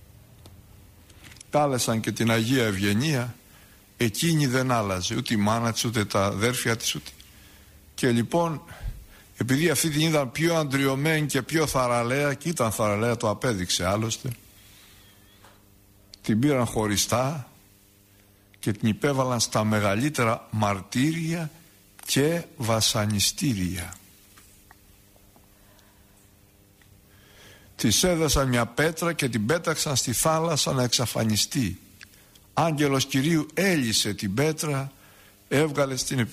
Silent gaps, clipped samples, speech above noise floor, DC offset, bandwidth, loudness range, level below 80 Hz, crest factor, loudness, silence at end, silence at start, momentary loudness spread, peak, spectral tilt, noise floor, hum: none; under 0.1%; 32 dB; under 0.1%; 15.5 kHz; 4 LU; -50 dBFS; 16 dB; -24 LUFS; 0 s; 0.45 s; 9 LU; -10 dBFS; -4 dB/octave; -57 dBFS; none